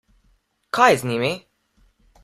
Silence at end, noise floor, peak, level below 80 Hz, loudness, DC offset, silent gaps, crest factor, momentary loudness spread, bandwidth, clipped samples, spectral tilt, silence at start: 0.85 s; -63 dBFS; -2 dBFS; -60 dBFS; -19 LUFS; under 0.1%; none; 22 dB; 12 LU; 15.5 kHz; under 0.1%; -4.5 dB/octave; 0.75 s